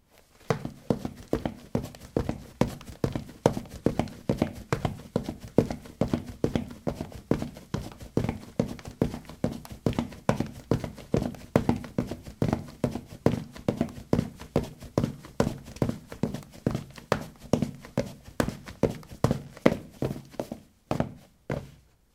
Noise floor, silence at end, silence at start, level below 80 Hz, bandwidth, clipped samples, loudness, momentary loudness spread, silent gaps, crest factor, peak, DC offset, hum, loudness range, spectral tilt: -57 dBFS; 0.4 s; 0.5 s; -46 dBFS; 17.5 kHz; under 0.1%; -31 LUFS; 7 LU; none; 30 dB; 0 dBFS; under 0.1%; none; 2 LU; -7 dB/octave